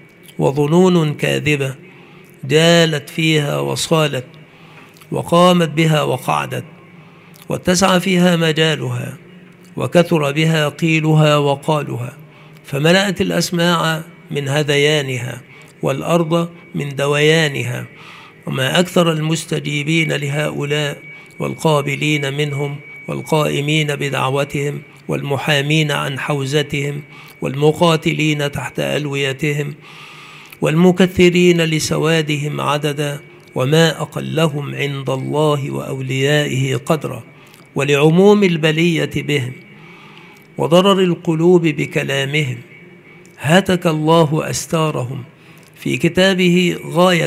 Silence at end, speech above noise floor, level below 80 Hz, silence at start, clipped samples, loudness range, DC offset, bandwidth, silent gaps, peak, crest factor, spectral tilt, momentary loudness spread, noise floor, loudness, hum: 0 s; 27 dB; -52 dBFS; 0.4 s; under 0.1%; 3 LU; under 0.1%; 15.5 kHz; none; 0 dBFS; 16 dB; -5.5 dB/octave; 14 LU; -42 dBFS; -16 LUFS; none